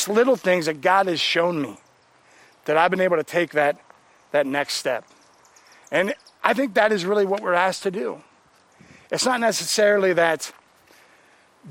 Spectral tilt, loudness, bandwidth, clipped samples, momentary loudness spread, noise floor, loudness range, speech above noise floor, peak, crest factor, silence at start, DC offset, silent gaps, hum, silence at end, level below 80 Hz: -3.5 dB/octave; -21 LUFS; 16.5 kHz; under 0.1%; 11 LU; -57 dBFS; 3 LU; 36 dB; 0 dBFS; 22 dB; 0 s; under 0.1%; none; none; 0 s; -72 dBFS